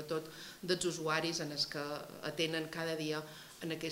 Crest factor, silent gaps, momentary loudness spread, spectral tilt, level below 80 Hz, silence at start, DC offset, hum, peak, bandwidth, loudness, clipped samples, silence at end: 22 dB; none; 10 LU; -3.5 dB/octave; -72 dBFS; 0 s; under 0.1%; none; -16 dBFS; 16 kHz; -38 LUFS; under 0.1%; 0 s